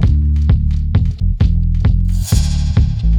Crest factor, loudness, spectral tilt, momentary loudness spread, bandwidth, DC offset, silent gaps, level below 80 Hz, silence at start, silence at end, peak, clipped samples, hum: 12 dB; -15 LUFS; -6.5 dB/octave; 2 LU; 16.5 kHz; under 0.1%; none; -14 dBFS; 0 s; 0 s; 0 dBFS; under 0.1%; none